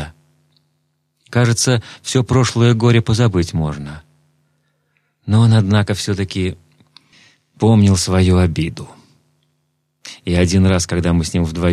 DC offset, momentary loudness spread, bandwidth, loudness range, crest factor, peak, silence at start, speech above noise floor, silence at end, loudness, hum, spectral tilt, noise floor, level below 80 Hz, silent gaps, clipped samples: under 0.1%; 13 LU; 13 kHz; 3 LU; 16 dB; -2 dBFS; 0 s; 53 dB; 0 s; -15 LUFS; none; -6 dB/octave; -67 dBFS; -38 dBFS; none; under 0.1%